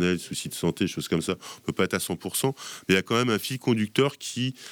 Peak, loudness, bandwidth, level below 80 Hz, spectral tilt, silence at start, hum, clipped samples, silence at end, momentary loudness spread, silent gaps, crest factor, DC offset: -8 dBFS; -27 LUFS; over 20 kHz; -60 dBFS; -4.5 dB/octave; 0 s; none; under 0.1%; 0 s; 8 LU; none; 20 dB; under 0.1%